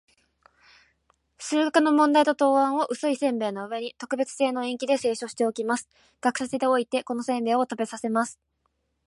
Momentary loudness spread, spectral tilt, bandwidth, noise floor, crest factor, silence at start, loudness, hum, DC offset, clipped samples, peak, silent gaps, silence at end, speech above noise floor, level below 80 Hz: 10 LU; -3.5 dB/octave; 11.5 kHz; -74 dBFS; 18 dB; 1.4 s; -25 LUFS; none; under 0.1%; under 0.1%; -8 dBFS; none; 0.75 s; 49 dB; -74 dBFS